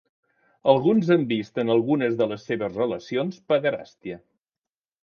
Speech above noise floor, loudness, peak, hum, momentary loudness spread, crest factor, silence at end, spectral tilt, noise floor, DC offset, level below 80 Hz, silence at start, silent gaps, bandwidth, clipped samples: over 67 dB; -23 LUFS; -2 dBFS; none; 15 LU; 22 dB; 0.85 s; -7.5 dB/octave; under -90 dBFS; under 0.1%; -66 dBFS; 0.65 s; none; 6.8 kHz; under 0.1%